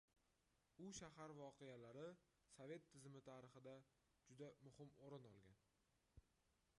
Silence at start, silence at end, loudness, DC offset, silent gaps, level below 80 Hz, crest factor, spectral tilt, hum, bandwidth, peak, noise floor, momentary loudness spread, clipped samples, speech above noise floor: 0.15 s; 0.05 s; -62 LUFS; under 0.1%; none; -84 dBFS; 20 dB; -5 dB/octave; none; 11 kHz; -44 dBFS; -86 dBFS; 7 LU; under 0.1%; 25 dB